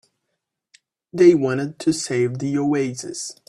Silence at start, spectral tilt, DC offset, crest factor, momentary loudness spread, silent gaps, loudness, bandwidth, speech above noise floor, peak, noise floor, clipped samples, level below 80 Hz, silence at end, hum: 1.15 s; -5.5 dB/octave; under 0.1%; 20 dB; 14 LU; none; -20 LUFS; 12 kHz; 59 dB; -2 dBFS; -78 dBFS; under 0.1%; -62 dBFS; 0.15 s; none